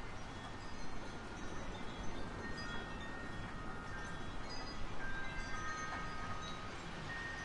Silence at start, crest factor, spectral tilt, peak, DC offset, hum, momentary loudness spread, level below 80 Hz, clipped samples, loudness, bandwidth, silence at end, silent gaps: 0 s; 14 dB; -4.5 dB/octave; -28 dBFS; under 0.1%; none; 5 LU; -50 dBFS; under 0.1%; -46 LUFS; 11 kHz; 0 s; none